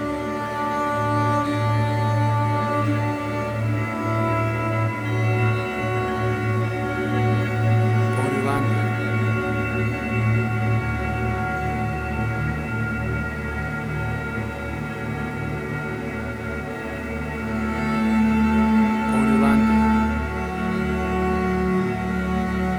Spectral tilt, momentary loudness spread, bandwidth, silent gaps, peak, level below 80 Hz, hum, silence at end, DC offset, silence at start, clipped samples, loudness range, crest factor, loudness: -7.5 dB/octave; 9 LU; 13.5 kHz; none; -6 dBFS; -36 dBFS; none; 0 s; under 0.1%; 0 s; under 0.1%; 7 LU; 16 dB; -23 LUFS